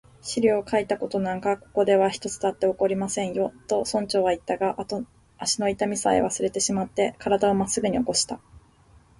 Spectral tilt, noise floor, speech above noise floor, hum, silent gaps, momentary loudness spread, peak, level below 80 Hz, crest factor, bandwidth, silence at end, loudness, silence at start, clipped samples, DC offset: -4 dB/octave; -56 dBFS; 31 dB; none; none; 7 LU; -8 dBFS; -56 dBFS; 16 dB; 11.5 kHz; 0.8 s; -25 LUFS; 0.25 s; under 0.1%; under 0.1%